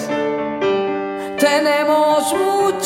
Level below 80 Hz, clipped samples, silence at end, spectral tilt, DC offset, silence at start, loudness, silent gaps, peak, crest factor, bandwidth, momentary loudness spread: -60 dBFS; under 0.1%; 0 s; -3.5 dB/octave; under 0.1%; 0 s; -17 LUFS; none; -4 dBFS; 14 dB; 17 kHz; 7 LU